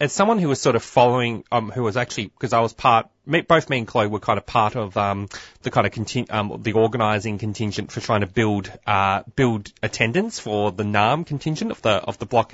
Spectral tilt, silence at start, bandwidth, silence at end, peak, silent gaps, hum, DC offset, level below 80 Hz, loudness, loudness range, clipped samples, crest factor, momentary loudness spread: -5.5 dB/octave; 0 s; 8 kHz; 0.1 s; -2 dBFS; none; none; under 0.1%; -52 dBFS; -21 LUFS; 3 LU; under 0.1%; 20 dB; 8 LU